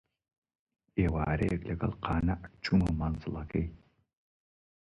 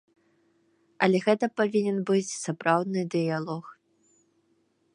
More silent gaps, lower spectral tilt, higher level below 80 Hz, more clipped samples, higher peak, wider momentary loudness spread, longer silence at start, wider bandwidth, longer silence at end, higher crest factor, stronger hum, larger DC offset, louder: neither; first, -8.5 dB/octave vs -5.5 dB/octave; first, -42 dBFS vs -80 dBFS; neither; second, -16 dBFS vs -6 dBFS; about the same, 8 LU vs 8 LU; about the same, 0.95 s vs 1 s; about the same, 10.5 kHz vs 11 kHz; about the same, 1.1 s vs 1.2 s; about the same, 18 dB vs 22 dB; neither; neither; second, -32 LUFS vs -27 LUFS